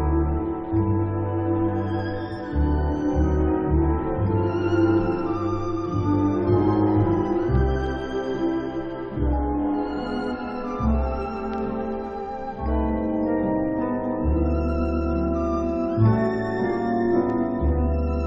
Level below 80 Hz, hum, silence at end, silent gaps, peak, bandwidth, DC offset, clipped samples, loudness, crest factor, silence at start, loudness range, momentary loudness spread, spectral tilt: -30 dBFS; none; 0 s; none; -8 dBFS; 6.4 kHz; under 0.1%; under 0.1%; -24 LUFS; 16 dB; 0 s; 4 LU; 8 LU; -9.5 dB/octave